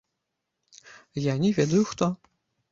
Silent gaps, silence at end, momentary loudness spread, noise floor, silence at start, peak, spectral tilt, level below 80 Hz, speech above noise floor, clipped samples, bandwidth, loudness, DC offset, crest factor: none; 0.55 s; 13 LU; -82 dBFS; 0.9 s; -8 dBFS; -6.5 dB/octave; -62 dBFS; 58 dB; under 0.1%; 7.8 kHz; -25 LUFS; under 0.1%; 20 dB